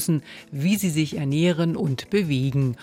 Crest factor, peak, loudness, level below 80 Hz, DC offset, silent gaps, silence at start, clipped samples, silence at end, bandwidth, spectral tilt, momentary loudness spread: 12 dB; -10 dBFS; -23 LUFS; -56 dBFS; under 0.1%; none; 0 s; under 0.1%; 0 s; 17 kHz; -6 dB/octave; 5 LU